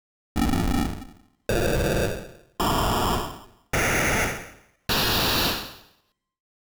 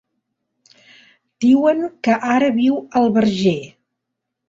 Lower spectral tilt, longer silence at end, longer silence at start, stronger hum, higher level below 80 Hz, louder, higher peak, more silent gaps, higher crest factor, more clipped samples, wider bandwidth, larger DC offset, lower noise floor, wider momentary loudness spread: second, -4 dB/octave vs -6.5 dB/octave; about the same, 0.8 s vs 0.85 s; second, 0.35 s vs 1.4 s; neither; first, -34 dBFS vs -58 dBFS; second, -24 LUFS vs -17 LUFS; second, -14 dBFS vs -2 dBFS; neither; about the same, 12 dB vs 16 dB; neither; first, over 20 kHz vs 7.8 kHz; neither; second, -67 dBFS vs -79 dBFS; first, 17 LU vs 5 LU